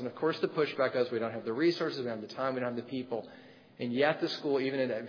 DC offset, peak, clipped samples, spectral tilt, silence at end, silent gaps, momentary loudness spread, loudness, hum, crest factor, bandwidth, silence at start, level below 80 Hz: under 0.1%; -14 dBFS; under 0.1%; -4 dB/octave; 0 s; none; 9 LU; -32 LUFS; none; 18 dB; 5.4 kHz; 0 s; -84 dBFS